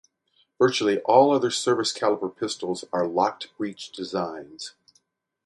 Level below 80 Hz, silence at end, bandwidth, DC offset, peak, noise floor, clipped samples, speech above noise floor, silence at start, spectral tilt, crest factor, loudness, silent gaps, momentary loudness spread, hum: -70 dBFS; 0.75 s; 11.5 kHz; under 0.1%; -2 dBFS; -68 dBFS; under 0.1%; 44 dB; 0.6 s; -4 dB/octave; 22 dB; -24 LUFS; none; 16 LU; none